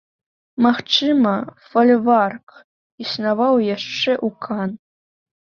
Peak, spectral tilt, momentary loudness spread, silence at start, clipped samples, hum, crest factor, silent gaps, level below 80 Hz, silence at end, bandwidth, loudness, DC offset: -2 dBFS; -5.5 dB/octave; 13 LU; 0.6 s; under 0.1%; none; 16 dB; 2.43-2.47 s, 2.64-2.98 s; -66 dBFS; 0.65 s; 6.8 kHz; -18 LUFS; under 0.1%